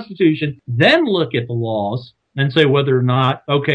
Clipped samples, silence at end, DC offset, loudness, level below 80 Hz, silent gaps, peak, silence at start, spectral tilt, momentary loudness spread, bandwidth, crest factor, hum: under 0.1%; 0 s; under 0.1%; -16 LUFS; -58 dBFS; none; 0 dBFS; 0 s; -7.5 dB/octave; 9 LU; 8.6 kHz; 16 dB; none